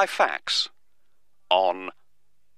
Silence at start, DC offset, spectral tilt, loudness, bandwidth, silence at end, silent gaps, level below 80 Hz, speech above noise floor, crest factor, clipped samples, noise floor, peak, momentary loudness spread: 0 s; 0.3%; -0.5 dB/octave; -24 LUFS; 14.5 kHz; 0.65 s; none; -76 dBFS; 52 dB; 22 dB; under 0.1%; -76 dBFS; -4 dBFS; 11 LU